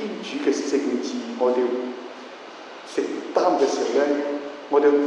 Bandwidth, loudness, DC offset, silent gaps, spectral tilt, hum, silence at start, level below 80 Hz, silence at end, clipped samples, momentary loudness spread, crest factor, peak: 10 kHz; -23 LUFS; under 0.1%; none; -4 dB/octave; none; 0 s; -86 dBFS; 0 s; under 0.1%; 18 LU; 18 dB; -6 dBFS